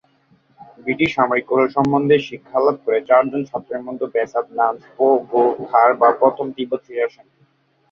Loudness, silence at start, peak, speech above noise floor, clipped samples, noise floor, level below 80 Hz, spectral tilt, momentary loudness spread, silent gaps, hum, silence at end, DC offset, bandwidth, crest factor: -18 LUFS; 0.6 s; -2 dBFS; 42 dB; under 0.1%; -59 dBFS; -60 dBFS; -7 dB/octave; 11 LU; none; none; 0.85 s; under 0.1%; 7 kHz; 16 dB